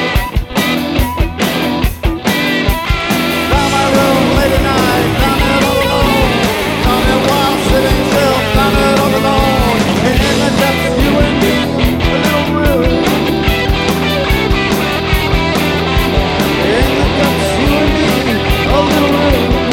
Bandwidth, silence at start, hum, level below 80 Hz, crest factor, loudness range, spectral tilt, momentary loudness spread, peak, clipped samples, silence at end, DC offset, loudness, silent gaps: 19 kHz; 0 s; none; -20 dBFS; 12 dB; 2 LU; -5 dB/octave; 3 LU; 0 dBFS; under 0.1%; 0 s; under 0.1%; -12 LUFS; none